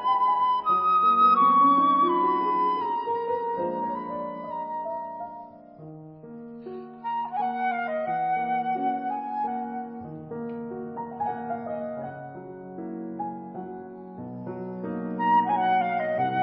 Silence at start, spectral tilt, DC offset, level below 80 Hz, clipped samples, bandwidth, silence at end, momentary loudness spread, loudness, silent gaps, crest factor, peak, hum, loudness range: 0 s; -10 dB/octave; under 0.1%; -70 dBFS; under 0.1%; 5.4 kHz; 0 s; 20 LU; -25 LUFS; none; 16 dB; -10 dBFS; none; 14 LU